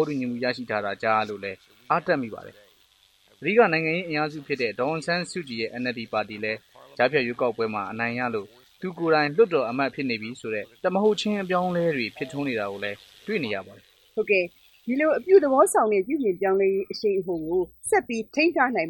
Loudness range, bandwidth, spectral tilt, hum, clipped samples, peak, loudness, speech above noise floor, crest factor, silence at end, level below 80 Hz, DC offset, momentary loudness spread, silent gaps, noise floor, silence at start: 5 LU; 17.5 kHz; -5 dB/octave; none; under 0.1%; -6 dBFS; -25 LUFS; 36 dB; 20 dB; 0 s; -66 dBFS; under 0.1%; 12 LU; none; -61 dBFS; 0 s